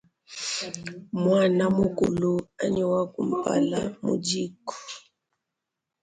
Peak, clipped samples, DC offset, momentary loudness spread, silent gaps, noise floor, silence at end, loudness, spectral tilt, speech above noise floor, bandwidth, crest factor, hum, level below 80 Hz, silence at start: -10 dBFS; under 0.1%; under 0.1%; 16 LU; none; -85 dBFS; 1.05 s; -26 LUFS; -5.5 dB/octave; 60 dB; 9.6 kHz; 16 dB; none; -58 dBFS; 0.3 s